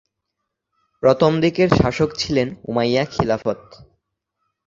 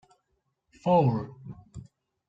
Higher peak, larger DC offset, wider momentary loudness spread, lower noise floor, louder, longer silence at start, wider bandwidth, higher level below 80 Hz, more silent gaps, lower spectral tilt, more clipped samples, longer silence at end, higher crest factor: first, 0 dBFS vs -12 dBFS; neither; second, 7 LU vs 25 LU; about the same, -79 dBFS vs -77 dBFS; first, -19 LUFS vs -26 LUFS; first, 1.05 s vs 0.85 s; about the same, 7.8 kHz vs 7.8 kHz; first, -44 dBFS vs -60 dBFS; neither; second, -6.5 dB/octave vs -9.5 dB/octave; neither; first, 0.85 s vs 0.45 s; about the same, 20 dB vs 18 dB